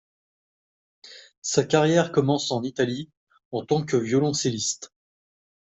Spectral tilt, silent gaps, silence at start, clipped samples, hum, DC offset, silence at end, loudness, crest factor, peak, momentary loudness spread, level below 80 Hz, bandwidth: -4.5 dB/octave; 1.37-1.42 s, 3.17-3.27 s, 3.45-3.51 s; 1.05 s; under 0.1%; none; under 0.1%; 0.75 s; -24 LUFS; 20 dB; -4 dBFS; 14 LU; -64 dBFS; 8.2 kHz